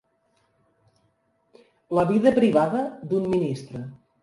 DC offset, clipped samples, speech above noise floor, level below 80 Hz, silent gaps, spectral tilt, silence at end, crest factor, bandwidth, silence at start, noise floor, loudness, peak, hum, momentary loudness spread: under 0.1%; under 0.1%; 46 dB; -60 dBFS; none; -8 dB/octave; 0.3 s; 20 dB; 11.5 kHz; 1.9 s; -68 dBFS; -23 LUFS; -4 dBFS; none; 18 LU